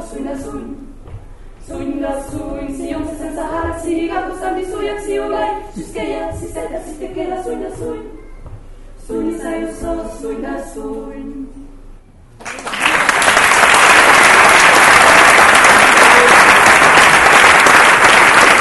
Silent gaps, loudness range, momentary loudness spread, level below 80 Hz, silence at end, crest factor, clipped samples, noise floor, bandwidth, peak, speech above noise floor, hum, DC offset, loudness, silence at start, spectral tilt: none; 19 LU; 20 LU; -36 dBFS; 0 s; 12 dB; 0.3%; -39 dBFS; over 20 kHz; 0 dBFS; 17 dB; none; under 0.1%; -8 LUFS; 0 s; -1.5 dB/octave